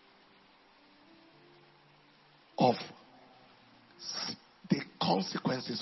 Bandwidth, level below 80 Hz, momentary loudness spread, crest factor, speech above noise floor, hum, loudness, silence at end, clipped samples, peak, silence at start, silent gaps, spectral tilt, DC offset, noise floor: 6 kHz; -78 dBFS; 18 LU; 24 dB; 30 dB; none; -33 LUFS; 0 s; under 0.1%; -12 dBFS; 2.6 s; none; -4 dB/octave; under 0.1%; -63 dBFS